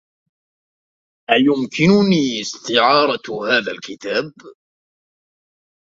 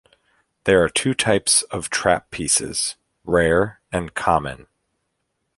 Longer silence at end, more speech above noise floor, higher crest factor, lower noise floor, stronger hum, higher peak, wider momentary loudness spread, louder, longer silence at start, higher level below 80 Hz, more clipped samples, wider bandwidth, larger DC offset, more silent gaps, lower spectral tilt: first, 1.45 s vs 1 s; first, over 73 dB vs 54 dB; about the same, 20 dB vs 20 dB; first, under -90 dBFS vs -74 dBFS; neither; about the same, 0 dBFS vs -2 dBFS; first, 13 LU vs 10 LU; first, -17 LUFS vs -20 LUFS; first, 1.3 s vs 0.65 s; second, -60 dBFS vs -44 dBFS; neither; second, 7.8 kHz vs 12 kHz; neither; neither; first, -5 dB/octave vs -3 dB/octave